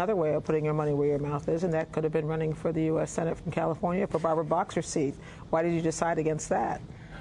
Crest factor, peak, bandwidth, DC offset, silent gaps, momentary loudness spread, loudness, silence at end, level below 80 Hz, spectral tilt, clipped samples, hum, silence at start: 18 dB; -10 dBFS; 11 kHz; under 0.1%; none; 4 LU; -29 LUFS; 0 s; -52 dBFS; -6.5 dB/octave; under 0.1%; none; 0 s